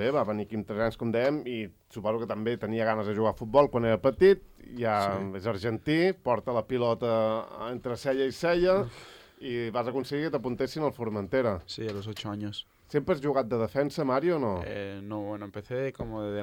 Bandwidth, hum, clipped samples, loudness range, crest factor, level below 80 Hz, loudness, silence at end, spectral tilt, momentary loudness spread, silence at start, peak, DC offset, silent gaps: 16.5 kHz; none; under 0.1%; 5 LU; 20 dB; -56 dBFS; -29 LUFS; 0 s; -7 dB/octave; 12 LU; 0 s; -8 dBFS; under 0.1%; none